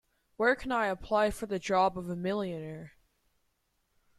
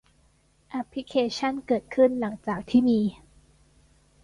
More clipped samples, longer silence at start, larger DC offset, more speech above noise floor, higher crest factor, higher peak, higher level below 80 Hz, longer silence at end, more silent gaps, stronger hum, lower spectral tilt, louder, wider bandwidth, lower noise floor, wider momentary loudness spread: neither; second, 0.4 s vs 0.7 s; neither; first, 46 dB vs 38 dB; about the same, 18 dB vs 18 dB; second, -14 dBFS vs -10 dBFS; about the same, -56 dBFS vs -58 dBFS; first, 1.3 s vs 1.1 s; neither; neither; about the same, -5.5 dB/octave vs -6 dB/octave; second, -31 LUFS vs -26 LUFS; first, 14.5 kHz vs 11 kHz; first, -76 dBFS vs -63 dBFS; about the same, 11 LU vs 12 LU